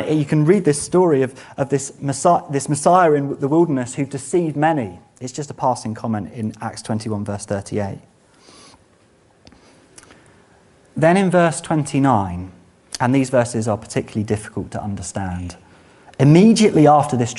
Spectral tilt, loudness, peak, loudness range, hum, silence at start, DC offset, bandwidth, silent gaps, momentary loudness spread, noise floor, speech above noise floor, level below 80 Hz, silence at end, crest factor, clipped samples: -6 dB/octave; -18 LUFS; 0 dBFS; 11 LU; none; 0 s; under 0.1%; 11.5 kHz; none; 16 LU; -54 dBFS; 37 dB; -52 dBFS; 0 s; 18 dB; under 0.1%